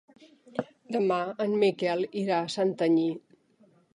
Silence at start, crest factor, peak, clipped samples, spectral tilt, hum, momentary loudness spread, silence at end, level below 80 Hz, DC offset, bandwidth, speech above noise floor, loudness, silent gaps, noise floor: 0.55 s; 16 dB; -12 dBFS; under 0.1%; -6 dB/octave; none; 12 LU; 0.75 s; -78 dBFS; under 0.1%; 11 kHz; 36 dB; -28 LUFS; none; -63 dBFS